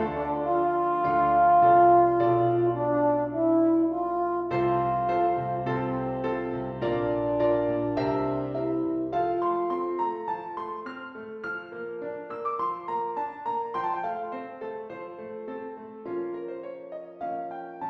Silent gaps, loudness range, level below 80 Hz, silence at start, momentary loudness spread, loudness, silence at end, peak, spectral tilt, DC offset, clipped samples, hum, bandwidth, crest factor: none; 12 LU; -56 dBFS; 0 s; 15 LU; -26 LUFS; 0 s; -10 dBFS; -9.5 dB/octave; under 0.1%; under 0.1%; none; 5.4 kHz; 16 dB